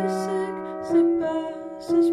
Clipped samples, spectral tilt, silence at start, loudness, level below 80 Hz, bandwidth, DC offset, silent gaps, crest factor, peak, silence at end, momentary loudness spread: under 0.1%; -6.5 dB/octave; 0 s; -24 LUFS; -64 dBFS; 11.5 kHz; under 0.1%; none; 12 dB; -10 dBFS; 0 s; 12 LU